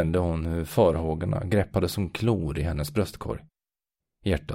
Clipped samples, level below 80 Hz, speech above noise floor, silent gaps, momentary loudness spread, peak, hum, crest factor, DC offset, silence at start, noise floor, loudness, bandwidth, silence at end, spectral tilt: under 0.1%; -40 dBFS; over 64 dB; none; 10 LU; -8 dBFS; none; 18 dB; under 0.1%; 0 s; under -90 dBFS; -27 LUFS; 16 kHz; 0 s; -7 dB/octave